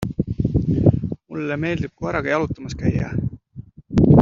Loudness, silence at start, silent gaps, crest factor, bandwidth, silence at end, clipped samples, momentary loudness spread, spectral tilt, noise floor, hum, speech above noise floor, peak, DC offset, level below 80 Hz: -22 LUFS; 0 s; none; 18 dB; 7.4 kHz; 0 s; under 0.1%; 12 LU; -8 dB/octave; -41 dBFS; none; 18 dB; -2 dBFS; under 0.1%; -36 dBFS